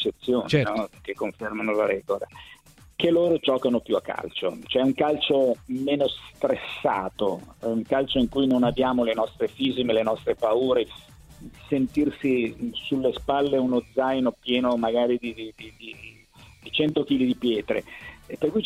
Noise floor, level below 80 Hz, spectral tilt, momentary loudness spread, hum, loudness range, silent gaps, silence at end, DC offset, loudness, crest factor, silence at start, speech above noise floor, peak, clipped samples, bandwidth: -51 dBFS; -52 dBFS; -6.5 dB/octave; 12 LU; none; 3 LU; none; 0 s; under 0.1%; -25 LUFS; 18 dB; 0 s; 27 dB; -6 dBFS; under 0.1%; 13.5 kHz